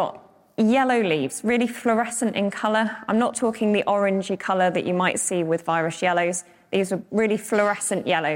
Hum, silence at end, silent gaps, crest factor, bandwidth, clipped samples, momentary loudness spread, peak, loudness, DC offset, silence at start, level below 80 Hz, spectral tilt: none; 0 s; none; 16 dB; 17 kHz; under 0.1%; 4 LU; -6 dBFS; -23 LUFS; under 0.1%; 0 s; -64 dBFS; -4.5 dB/octave